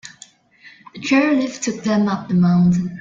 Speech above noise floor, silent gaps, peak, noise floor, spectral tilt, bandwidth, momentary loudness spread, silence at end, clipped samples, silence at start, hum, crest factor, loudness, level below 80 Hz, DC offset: 31 dB; none; -4 dBFS; -48 dBFS; -6.5 dB/octave; 7.6 kHz; 9 LU; 0 s; under 0.1%; 0.05 s; none; 16 dB; -17 LUFS; -54 dBFS; under 0.1%